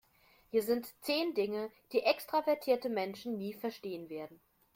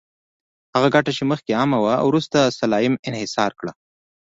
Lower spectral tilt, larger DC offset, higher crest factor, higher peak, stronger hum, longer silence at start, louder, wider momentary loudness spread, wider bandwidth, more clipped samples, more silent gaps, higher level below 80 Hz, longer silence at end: about the same, -4.5 dB/octave vs -5.5 dB/octave; neither; about the same, 22 dB vs 18 dB; second, -14 dBFS vs -2 dBFS; neither; second, 0.55 s vs 0.75 s; second, -35 LUFS vs -20 LUFS; first, 11 LU vs 7 LU; first, 16.5 kHz vs 8 kHz; neither; second, none vs 2.99-3.03 s; second, -78 dBFS vs -58 dBFS; about the same, 0.4 s vs 0.5 s